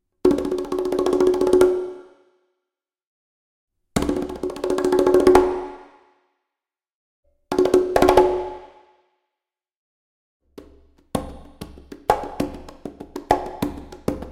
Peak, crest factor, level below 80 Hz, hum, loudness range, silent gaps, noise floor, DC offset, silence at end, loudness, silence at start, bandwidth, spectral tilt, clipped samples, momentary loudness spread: 0 dBFS; 22 dB; -42 dBFS; none; 10 LU; 3.07-3.68 s, 6.95-7.23 s, 9.76-10.40 s; -87 dBFS; under 0.1%; 0 s; -20 LUFS; 0.25 s; 16 kHz; -6 dB/octave; under 0.1%; 22 LU